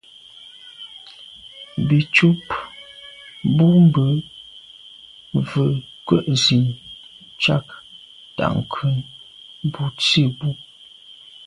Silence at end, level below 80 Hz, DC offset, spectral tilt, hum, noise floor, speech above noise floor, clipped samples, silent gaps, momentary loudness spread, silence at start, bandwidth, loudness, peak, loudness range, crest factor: 0.85 s; -54 dBFS; under 0.1%; -6 dB/octave; none; -45 dBFS; 27 dB; under 0.1%; none; 25 LU; 0.65 s; 11 kHz; -19 LUFS; -2 dBFS; 4 LU; 20 dB